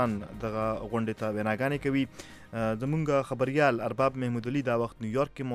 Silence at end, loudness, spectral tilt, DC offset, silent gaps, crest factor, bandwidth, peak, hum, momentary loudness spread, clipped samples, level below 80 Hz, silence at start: 0 s; -30 LUFS; -7 dB/octave; under 0.1%; none; 20 dB; 14 kHz; -10 dBFS; none; 7 LU; under 0.1%; -54 dBFS; 0 s